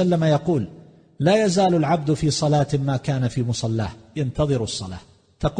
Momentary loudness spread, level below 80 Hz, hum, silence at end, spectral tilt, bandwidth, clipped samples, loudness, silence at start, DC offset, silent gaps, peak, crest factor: 10 LU; -44 dBFS; none; 0 s; -6 dB/octave; 9.8 kHz; under 0.1%; -22 LUFS; 0 s; under 0.1%; none; -4 dBFS; 16 dB